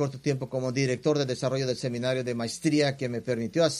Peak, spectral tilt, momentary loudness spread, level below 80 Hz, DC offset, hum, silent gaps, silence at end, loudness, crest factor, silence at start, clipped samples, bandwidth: -12 dBFS; -5.5 dB/octave; 5 LU; -64 dBFS; under 0.1%; none; none; 0 s; -28 LUFS; 16 dB; 0 s; under 0.1%; 13.5 kHz